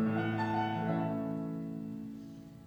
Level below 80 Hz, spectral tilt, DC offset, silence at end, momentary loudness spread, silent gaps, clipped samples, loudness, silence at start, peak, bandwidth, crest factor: -68 dBFS; -8.5 dB/octave; under 0.1%; 0 s; 12 LU; none; under 0.1%; -36 LUFS; 0 s; -22 dBFS; 18 kHz; 14 dB